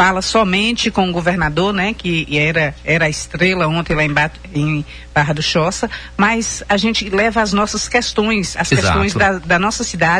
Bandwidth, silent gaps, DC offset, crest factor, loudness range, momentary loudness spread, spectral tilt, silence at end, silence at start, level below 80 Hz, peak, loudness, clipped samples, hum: 10.5 kHz; none; under 0.1%; 16 dB; 2 LU; 5 LU; -4 dB/octave; 0 s; 0 s; -34 dBFS; 0 dBFS; -16 LUFS; under 0.1%; none